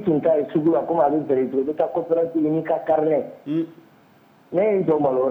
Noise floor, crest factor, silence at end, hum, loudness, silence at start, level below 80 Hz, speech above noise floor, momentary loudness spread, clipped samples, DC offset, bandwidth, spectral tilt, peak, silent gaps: -54 dBFS; 14 dB; 0 s; none; -21 LUFS; 0 s; -64 dBFS; 33 dB; 7 LU; under 0.1%; under 0.1%; 4 kHz; -10 dB/octave; -6 dBFS; none